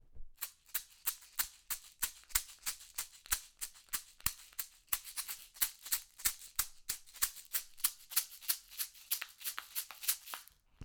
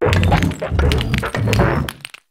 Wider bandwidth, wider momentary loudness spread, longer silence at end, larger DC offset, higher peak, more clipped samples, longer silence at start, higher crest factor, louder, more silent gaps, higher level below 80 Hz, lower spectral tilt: first, over 20 kHz vs 16.5 kHz; about the same, 9 LU vs 8 LU; second, 0 s vs 0.35 s; neither; second, -12 dBFS vs 0 dBFS; neither; about the same, 0.05 s vs 0 s; first, 30 dB vs 16 dB; second, -38 LUFS vs -18 LUFS; neither; second, -60 dBFS vs -24 dBFS; second, 2 dB/octave vs -6 dB/octave